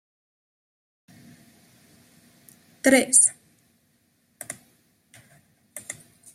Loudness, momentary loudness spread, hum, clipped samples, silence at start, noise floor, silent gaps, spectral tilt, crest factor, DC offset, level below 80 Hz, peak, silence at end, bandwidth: -18 LUFS; 25 LU; none; under 0.1%; 2.85 s; -67 dBFS; none; -1 dB/octave; 26 dB; under 0.1%; -72 dBFS; -4 dBFS; 0.4 s; 15.5 kHz